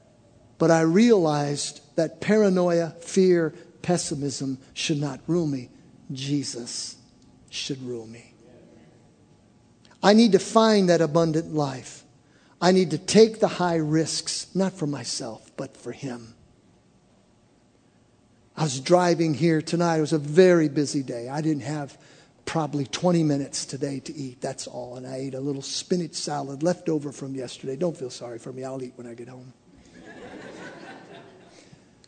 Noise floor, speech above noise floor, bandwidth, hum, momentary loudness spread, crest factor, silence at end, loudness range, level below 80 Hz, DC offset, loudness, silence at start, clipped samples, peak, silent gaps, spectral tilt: -60 dBFS; 36 dB; 9.4 kHz; none; 19 LU; 24 dB; 0.85 s; 14 LU; -66 dBFS; under 0.1%; -24 LUFS; 0.6 s; under 0.1%; -2 dBFS; none; -5.5 dB/octave